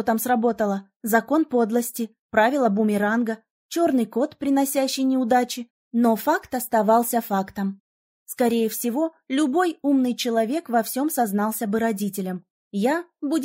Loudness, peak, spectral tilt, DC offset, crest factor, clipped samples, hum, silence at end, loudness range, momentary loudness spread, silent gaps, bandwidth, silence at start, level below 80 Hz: -23 LUFS; -6 dBFS; -4.5 dB/octave; under 0.1%; 16 dB; under 0.1%; none; 0 s; 2 LU; 9 LU; 0.96-1.00 s, 2.19-2.29 s, 3.51-3.69 s, 5.70-5.91 s, 7.80-8.26 s, 12.50-12.71 s; 16.5 kHz; 0 s; -66 dBFS